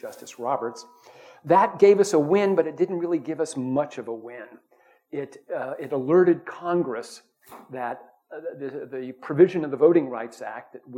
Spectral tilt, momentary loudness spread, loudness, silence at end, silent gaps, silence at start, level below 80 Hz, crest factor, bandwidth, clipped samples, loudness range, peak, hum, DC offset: -6.5 dB/octave; 19 LU; -23 LUFS; 0 s; none; 0.05 s; -74 dBFS; 20 dB; 12 kHz; under 0.1%; 7 LU; -4 dBFS; none; under 0.1%